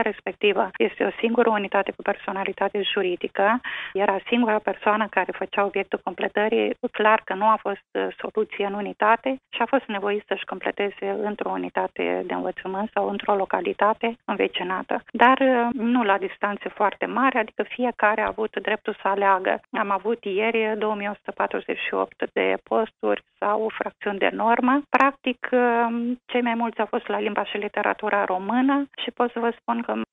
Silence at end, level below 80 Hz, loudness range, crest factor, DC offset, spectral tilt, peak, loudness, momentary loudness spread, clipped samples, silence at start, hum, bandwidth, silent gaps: 0.1 s; -66 dBFS; 3 LU; 22 dB; under 0.1%; -7 dB/octave; -2 dBFS; -24 LUFS; 7 LU; under 0.1%; 0 s; none; 4 kHz; none